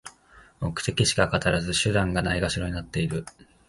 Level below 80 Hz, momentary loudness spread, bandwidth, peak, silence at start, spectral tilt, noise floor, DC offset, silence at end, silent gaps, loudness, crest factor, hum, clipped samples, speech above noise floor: -42 dBFS; 11 LU; 11.5 kHz; -6 dBFS; 0.05 s; -4.5 dB/octave; -54 dBFS; under 0.1%; 0.4 s; none; -25 LUFS; 22 dB; none; under 0.1%; 29 dB